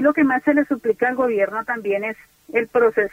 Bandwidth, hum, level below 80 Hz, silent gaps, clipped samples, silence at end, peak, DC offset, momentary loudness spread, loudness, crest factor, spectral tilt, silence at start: 15.5 kHz; none; -60 dBFS; none; under 0.1%; 0.05 s; -6 dBFS; under 0.1%; 7 LU; -20 LUFS; 14 dB; -7 dB/octave; 0 s